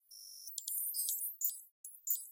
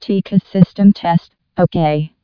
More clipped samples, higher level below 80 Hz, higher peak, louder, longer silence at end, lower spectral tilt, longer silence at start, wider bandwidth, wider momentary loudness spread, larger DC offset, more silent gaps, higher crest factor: second, under 0.1% vs 0.4%; second, under -90 dBFS vs -50 dBFS; second, -18 dBFS vs 0 dBFS; second, -37 LUFS vs -14 LUFS; second, 0 s vs 0.15 s; second, 8 dB/octave vs -10 dB/octave; about the same, 0.1 s vs 0 s; first, 17 kHz vs 5.4 kHz; first, 14 LU vs 7 LU; neither; first, 1.71-1.84 s vs none; first, 24 dB vs 14 dB